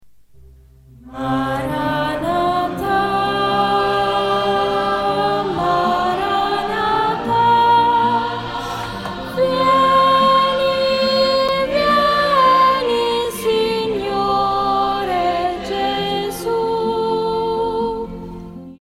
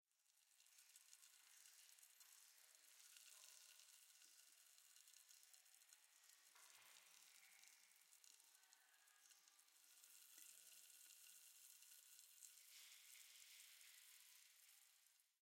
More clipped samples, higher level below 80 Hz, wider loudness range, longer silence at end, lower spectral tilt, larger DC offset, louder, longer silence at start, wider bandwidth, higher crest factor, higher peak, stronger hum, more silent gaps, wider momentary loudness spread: neither; first, -44 dBFS vs under -90 dBFS; about the same, 5 LU vs 5 LU; about the same, 0.05 s vs 0.1 s; first, -5 dB/octave vs 4 dB/octave; neither; first, -17 LUFS vs -66 LUFS; first, 0.4 s vs 0.1 s; about the same, 16.5 kHz vs 16.5 kHz; second, 14 dB vs 26 dB; first, -4 dBFS vs -44 dBFS; neither; neither; first, 10 LU vs 6 LU